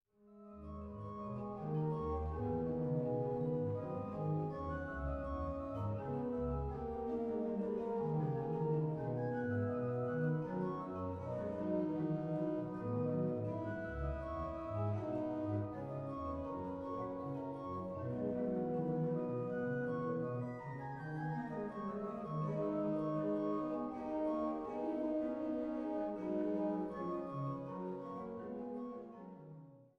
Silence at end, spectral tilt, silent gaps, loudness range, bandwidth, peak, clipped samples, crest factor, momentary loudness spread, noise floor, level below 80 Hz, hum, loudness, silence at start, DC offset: 0.1 s; -10.5 dB/octave; none; 3 LU; 6.2 kHz; -26 dBFS; under 0.1%; 14 dB; 7 LU; -60 dBFS; -56 dBFS; none; -40 LUFS; 0.25 s; under 0.1%